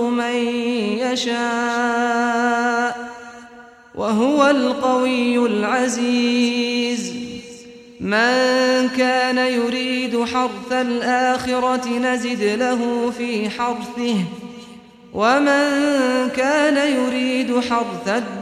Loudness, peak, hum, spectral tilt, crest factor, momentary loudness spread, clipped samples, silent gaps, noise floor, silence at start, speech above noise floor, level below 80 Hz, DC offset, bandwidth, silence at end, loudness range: -19 LUFS; -4 dBFS; none; -4 dB/octave; 16 dB; 10 LU; under 0.1%; none; -43 dBFS; 0 s; 25 dB; -58 dBFS; under 0.1%; 13.5 kHz; 0 s; 3 LU